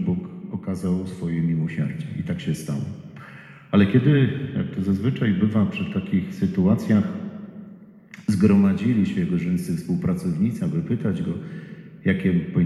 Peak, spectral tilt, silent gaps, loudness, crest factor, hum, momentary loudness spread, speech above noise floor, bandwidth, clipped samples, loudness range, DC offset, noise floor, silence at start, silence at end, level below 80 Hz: -6 dBFS; -8 dB/octave; none; -23 LUFS; 16 dB; none; 16 LU; 23 dB; 12.5 kHz; under 0.1%; 4 LU; under 0.1%; -45 dBFS; 0 s; 0 s; -52 dBFS